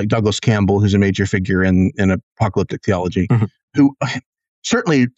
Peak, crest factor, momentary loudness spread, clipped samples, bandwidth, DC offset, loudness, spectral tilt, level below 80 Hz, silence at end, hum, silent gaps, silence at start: -4 dBFS; 12 dB; 6 LU; under 0.1%; 8.2 kHz; under 0.1%; -17 LUFS; -6.5 dB/octave; -44 dBFS; 0.1 s; none; 2.23-2.36 s, 3.63-3.68 s, 4.26-4.33 s, 4.48-4.62 s; 0 s